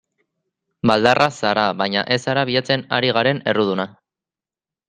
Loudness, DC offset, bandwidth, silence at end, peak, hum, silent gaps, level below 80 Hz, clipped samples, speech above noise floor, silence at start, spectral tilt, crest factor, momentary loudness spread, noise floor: -18 LUFS; under 0.1%; 10.5 kHz; 1 s; 0 dBFS; none; none; -58 dBFS; under 0.1%; over 72 dB; 0.85 s; -5 dB/octave; 20 dB; 6 LU; under -90 dBFS